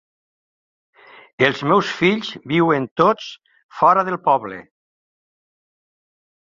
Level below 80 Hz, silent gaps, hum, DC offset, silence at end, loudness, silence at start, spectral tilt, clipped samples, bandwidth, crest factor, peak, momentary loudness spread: -62 dBFS; 2.91-2.96 s, 3.63-3.69 s; none; under 0.1%; 1.95 s; -18 LUFS; 1.4 s; -6 dB/octave; under 0.1%; 7.6 kHz; 20 dB; -2 dBFS; 11 LU